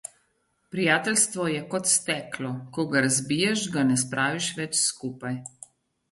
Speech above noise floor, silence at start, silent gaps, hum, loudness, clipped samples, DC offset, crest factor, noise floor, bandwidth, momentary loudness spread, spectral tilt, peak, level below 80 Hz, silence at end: 45 dB; 0.75 s; none; none; -25 LUFS; under 0.1%; under 0.1%; 20 dB; -71 dBFS; 12 kHz; 12 LU; -3 dB/octave; -8 dBFS; -68 dBFS; 0.65 s